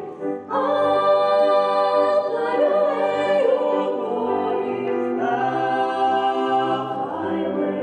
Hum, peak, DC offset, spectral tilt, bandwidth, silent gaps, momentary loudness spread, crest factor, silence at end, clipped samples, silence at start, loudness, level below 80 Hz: none; -6 dBFS; under 0.1%; -6 dB/octave; 9.2 kHz; none; 7 LU; 14 dB; 0 s; under 0.1%; 0 s; -21 LUFS; -78 dBFS